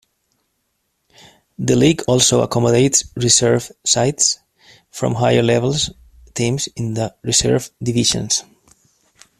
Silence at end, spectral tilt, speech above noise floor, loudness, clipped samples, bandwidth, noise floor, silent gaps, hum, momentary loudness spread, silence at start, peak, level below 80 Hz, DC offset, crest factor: 1 s; -3.5 dB/octave; 53 dB; -16 LUFS; under 0.1%; 14.5 kHz; -70 dBFS; none; none; 10 LU; 1.6 s; 0 dBFS; -46 dBFS; under 0.1%; 18 dB